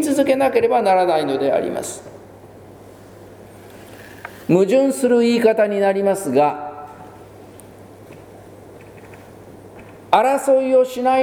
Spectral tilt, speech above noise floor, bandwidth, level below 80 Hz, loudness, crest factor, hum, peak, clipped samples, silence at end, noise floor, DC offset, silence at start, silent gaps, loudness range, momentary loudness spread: -5 dB/octave; 25 dB; 20 kHz; -58 dBFS; -17 LUFS; 20 dB; none; 0 dBFS; under 0.1%; 0 s; -41 dBFS; under 0.1%; 0 s; none; 10 LU; 21 LU